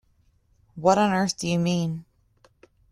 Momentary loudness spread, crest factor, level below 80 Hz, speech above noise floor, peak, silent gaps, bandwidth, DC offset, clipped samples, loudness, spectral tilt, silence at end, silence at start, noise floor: 9 LU; 20 dB; -60 dBFS; 41 dB; -6 dBFS; none; 12 kHz; under 0.1%; under 0.1%; -23 LUFS; -5.5 dB/octave; 0.9 s; 0.75 s; -64 dBFS